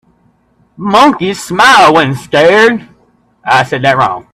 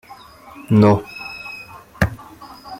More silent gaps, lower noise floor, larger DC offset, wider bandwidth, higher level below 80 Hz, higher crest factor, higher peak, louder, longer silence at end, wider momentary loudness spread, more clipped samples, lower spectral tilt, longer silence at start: neither; first, -52 dBFS vs -42 dBFS; neither; about the same, 15.5 kHz vs 16 kHz; second, -48 dBFS vs -42 dBFS; second, 10 dB vs 20 dB; about the same, 0 dBFS vs -2 dBFS; first, -8 LUFS vs -18 LUFS; about the same, 0.1 s vs 0 s; second, 11 LU vs 25 LU; first, 0.3% vs under 0.1%; second, -4.5 dB/octave vs -8 dB/octave; about the same, 0.8 s vs 0.7 s